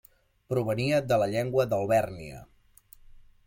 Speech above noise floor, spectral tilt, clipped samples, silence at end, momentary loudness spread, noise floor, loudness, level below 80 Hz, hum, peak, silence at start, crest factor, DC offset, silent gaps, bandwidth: 30 dB; -6.5 dB/octave; under 0.1%; 0.25 s; 17 LU; -56 dBFS; -27 LUFS; -56 dBFS; none; -12 dBFS; 0.5 s; 18 dB; under 0.1%; none; 16.5 kHz